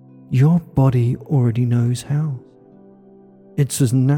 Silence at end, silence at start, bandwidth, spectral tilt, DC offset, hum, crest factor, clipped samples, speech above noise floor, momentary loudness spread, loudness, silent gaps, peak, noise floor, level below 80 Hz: 0 s; 0.3 s; 17 kHz; -7.5 dB/octave; under 0.1%; none; 12 dB; under 0.1%; 30 dB; 8 LU; -18 LUFS; none; -6 dBFS; -46 dBFS; -48 dBFS